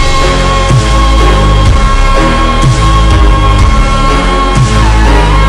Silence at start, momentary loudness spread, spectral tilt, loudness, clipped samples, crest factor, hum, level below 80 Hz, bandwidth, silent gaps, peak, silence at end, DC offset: 0 s; 2 LU; -5.5 dB/octave; -8 LUFS; 2%; 6 dB; none; -8 dBFS; 11 kHz; none; 0 dBFS; 0 s; under 0.1%